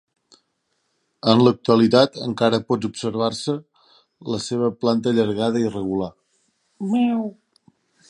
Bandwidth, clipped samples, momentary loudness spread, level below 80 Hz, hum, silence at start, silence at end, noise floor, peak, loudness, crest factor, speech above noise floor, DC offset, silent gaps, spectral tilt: 10.5 kHz; under 0.1%; 12 LU; -58 dBFS; none; 1.25 s; 0.75 s; -72 dBFS; 0 dBFS; -20 LUFS; 22 dB; 52 dB; under 0.1%; none; -6 dB/octave